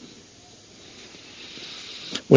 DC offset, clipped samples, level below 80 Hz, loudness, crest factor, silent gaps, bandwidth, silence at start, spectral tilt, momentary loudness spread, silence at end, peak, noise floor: under 0.1%; under 0.1%; -66 dBFS; -38 LUFS; 26 dB; none; 7.6 kHz; 2.05 s; -6 dB/octave; 14 LU; 0 s; 0 dBFS; -49 dBFS